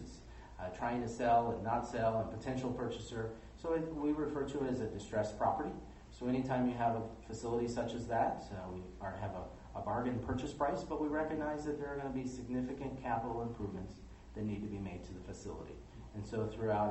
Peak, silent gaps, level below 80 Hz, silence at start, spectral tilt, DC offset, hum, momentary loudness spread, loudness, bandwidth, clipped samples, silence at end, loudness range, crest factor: -20 dBFS; none; -56 dBFS; 0 s; -7 dB/octave; under 0.1%; none; 12 LU; -39 LUFS; 8.4 kHz; under 0.1%; 0 s; 5 LU; 18 dB